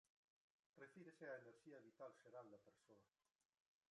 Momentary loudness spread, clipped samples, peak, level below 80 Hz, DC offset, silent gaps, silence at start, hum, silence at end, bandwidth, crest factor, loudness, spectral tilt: 8 LU; under 0.1%; -44 dBFS; under -90 dBFS; under 0.1%; none; 0.75 s; none; 0.85 s; 10.5 kHz; 20 dB; -62 LUFS; -6 dB/octave